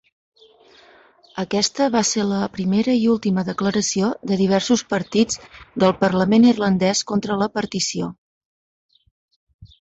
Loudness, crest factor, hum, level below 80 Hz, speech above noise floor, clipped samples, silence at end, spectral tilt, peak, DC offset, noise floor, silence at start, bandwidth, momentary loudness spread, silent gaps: -19 LUFS; 18 dB; none; -56 dBFS; 32 dB; under 0.1%; 0.2 s; -4.5 dB/octave; -4 dBFS; under 0.1%; -51 dBFS; 1.35 s; 8.2 kHz; 7 LU; 8.18-8.89 s, 9.11-9.28 s, 9.36-9.47 s, 9.54-9.59 s